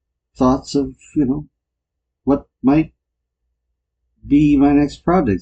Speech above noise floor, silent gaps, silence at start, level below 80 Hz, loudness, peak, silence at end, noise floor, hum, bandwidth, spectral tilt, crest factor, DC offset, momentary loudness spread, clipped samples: 63 dB; none; 0.4 s; -38 dBFS; -17 LUFS; -2 dBFS; 0 s; -79 dBFS; none; 8.2 kHz; -7.5 dB/octave; 16 dB; under 0.1%; 10 LU; under 0.1%